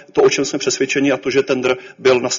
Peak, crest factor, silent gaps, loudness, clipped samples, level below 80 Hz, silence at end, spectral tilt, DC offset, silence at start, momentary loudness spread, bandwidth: -2 dBFS; 14 dB; none; -17 LUFS; under 0.1%; -58 dBFS; 0 s; -3 dB/octave; under 0.1%; 0.15 s; 4 LU; 7.6 kHz